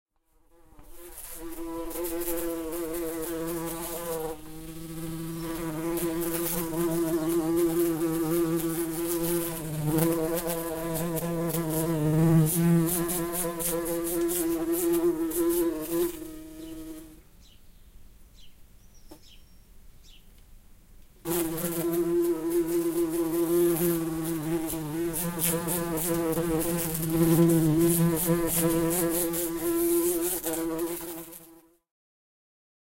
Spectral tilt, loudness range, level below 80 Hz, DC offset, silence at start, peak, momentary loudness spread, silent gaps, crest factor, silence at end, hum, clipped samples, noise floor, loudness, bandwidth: -5.5 dB/octave; 9 LU; -48 dBFS; under 0.1%; 0.8 s; -8 dBFS; 14 LU; none; 20 dB; 1.35 s; none; under 0.1%; -63 dBFS; -27 LUFS; 16.5 kHz